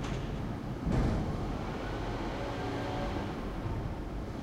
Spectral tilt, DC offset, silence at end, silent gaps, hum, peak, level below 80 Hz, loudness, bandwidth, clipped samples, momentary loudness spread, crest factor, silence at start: -7 dB/octave; under 0.1%; 0 s; none; none; -18 dBFS; -40 dBFS; -36 LUFS; 14.5 kHz; under 0.1%; 6 LU; 16 dB; 0 s